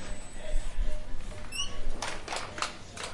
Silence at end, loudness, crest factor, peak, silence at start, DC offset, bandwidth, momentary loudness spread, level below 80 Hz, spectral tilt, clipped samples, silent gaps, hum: 0 s; -37 LUFS; 16 dB; -12 dBFS; 0 s; under 0.1%; 11.5 kHz; 8 LU; -34 dBFS; -2.5 dB/octave; under 0.1%; none; none